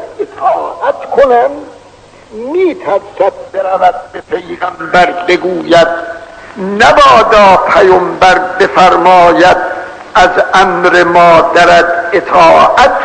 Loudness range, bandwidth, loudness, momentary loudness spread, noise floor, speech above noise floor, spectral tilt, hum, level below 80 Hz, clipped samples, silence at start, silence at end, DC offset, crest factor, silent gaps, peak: 7 LU; 11 kHz; -7 LUFS; 15 LU; -37 dBFS; 30 dB; -4.5 dB/octave; none; -36 dBFS; 3%; 0 s; 0 s; under 0.1%; 8 dB; none; 0 dBFS